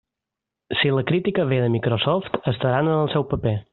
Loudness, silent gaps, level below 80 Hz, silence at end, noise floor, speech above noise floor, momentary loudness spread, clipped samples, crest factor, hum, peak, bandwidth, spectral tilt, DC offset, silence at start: -22 LUFS; none; -50 dBFS; 0.1 s; -85 dBFS; 64 dB; 4 LU; under 0.1%; 18 dB; none; -4 dBFS; 4.3 kHz; -5 dB/octave; under 0.1%; 0.7 s